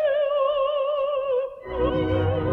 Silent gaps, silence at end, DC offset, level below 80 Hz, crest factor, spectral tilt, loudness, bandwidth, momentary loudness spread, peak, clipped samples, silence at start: none; 0 s; under 0.1%; -42 dBFS; 12 dB; -9 dB/octave; -24 LUFS; 4.7 kHz; 4 LU; -12 dBFS; under 0.1%; 0 s